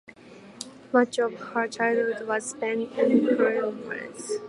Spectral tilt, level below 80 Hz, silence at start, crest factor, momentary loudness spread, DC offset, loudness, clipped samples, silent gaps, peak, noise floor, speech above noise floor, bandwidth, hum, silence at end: -4 dB/octave; -74 dBFS; 0.1 s; 20 dB; 13 LU; under 0.1%; -26 LUFS; under 0.1%; none; -6 dBFS; -48 dBFS; 23 dB; 11.5 kHz; none; 0 s